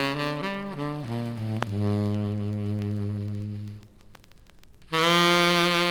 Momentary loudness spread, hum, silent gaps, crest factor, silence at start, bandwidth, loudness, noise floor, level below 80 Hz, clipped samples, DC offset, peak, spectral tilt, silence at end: 14 LU; none; none; 20 dB; 0 s; over 20 kHz; -26 LUFS; -51 dBFS; -56 dBFS; under 0.1%; under 0.1%; -8 dBFS; -5 dB/octave; 0 s